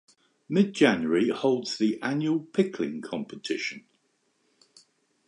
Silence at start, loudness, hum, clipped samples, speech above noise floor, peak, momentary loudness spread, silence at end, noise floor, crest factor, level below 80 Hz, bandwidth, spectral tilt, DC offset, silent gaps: 0.5 s; -27 LUFS; none; under 0.1%; 46 dB; -6 dBFS; 13 LU; 1.5 s; -72 dBFS; 20 dB; -72 dBFS; 10.5 kHz; -5.5 dB/octave; under 0.1%; none